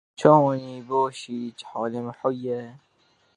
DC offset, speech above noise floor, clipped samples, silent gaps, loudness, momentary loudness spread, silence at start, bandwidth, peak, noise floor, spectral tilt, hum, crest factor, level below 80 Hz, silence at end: under 0.1%; 41 dB; under 0.1%; none; -24 LUFS; 16 LU; 0.2 s; 11 kHz; -2 dBFS; -64 dBFS; -7 dB/octave; none; 24 dB; -72 dBFS; 0.6 s